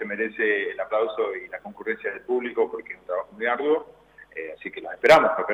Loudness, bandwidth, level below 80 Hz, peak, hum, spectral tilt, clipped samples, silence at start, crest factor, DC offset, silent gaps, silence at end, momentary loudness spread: -24 LUFS; 15 kHz; -64 dBFS; -6 dBFS; none; -4.5 dB/octave; under 0.1%; 0 s; 18 dB; under 0.1%; none; 0 s; 19 LU